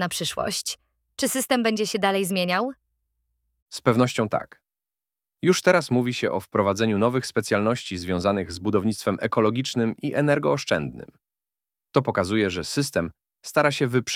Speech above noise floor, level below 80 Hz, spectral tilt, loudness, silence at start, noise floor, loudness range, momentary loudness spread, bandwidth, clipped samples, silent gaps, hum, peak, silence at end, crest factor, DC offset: over 67 dB; -58 dBFS; -4.5 dB/octave; -24 LUFS; 0 s; under -90 dBFS; 3 LU; 7 LU; 17 kHz; under 0.1%; 3.62-3.66 s; none; -2 dBFS; 0 s; 22 dB; under 0.1%